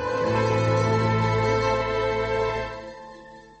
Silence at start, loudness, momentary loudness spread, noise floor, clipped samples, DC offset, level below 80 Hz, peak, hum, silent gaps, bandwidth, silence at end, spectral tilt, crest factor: 0 s; -23 LUFS; 16 LU; -45 dBFS; under 0.1%; under 0.1%; -44 dBFS; -12 dBFS; none; none; 8.4 kHz; 0.2 s; -6.5 dB/octave; 12 dB